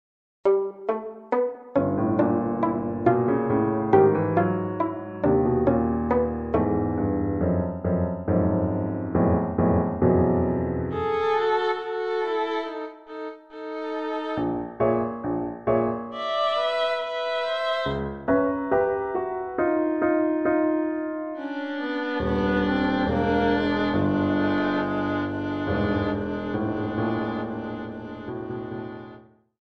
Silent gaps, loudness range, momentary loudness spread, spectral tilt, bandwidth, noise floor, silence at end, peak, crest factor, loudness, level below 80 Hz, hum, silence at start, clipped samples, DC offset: none; 5 LU; 9 LU; -8.5 dB/octave; 7 kHz; -49 dBFS; 0.4 s; -6 dBFS; 18 dB; -25 LUFS; -46 dBFS; none; 0.45 s; under 0.1%; under 0.1%